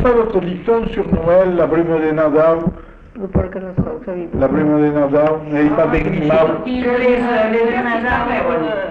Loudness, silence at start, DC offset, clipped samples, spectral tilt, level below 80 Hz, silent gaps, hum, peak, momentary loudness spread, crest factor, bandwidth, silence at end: -16 LUFS; 0 s; under 0.1%; under 0.1%; -9 dB/octave; -34 dBFS; none; none; -4 dBFS; 8 LU; 12 dB; 5.8 kHz; 0 s